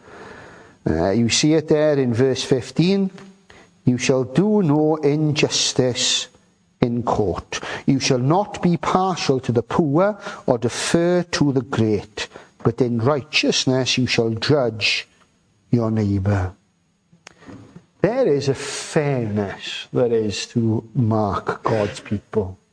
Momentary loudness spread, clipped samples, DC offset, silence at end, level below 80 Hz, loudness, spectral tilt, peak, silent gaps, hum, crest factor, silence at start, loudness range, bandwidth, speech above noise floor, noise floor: 7 LU; under 0.1%; under 0.1%; 0.2 s; -50 dBFS; -20 LUFS; -5 dB/octave; 0 dBFS; none; none; 20 dB; 0.1 s; 4 LU; 10.5 kHz; 44 dB; -63 dBFS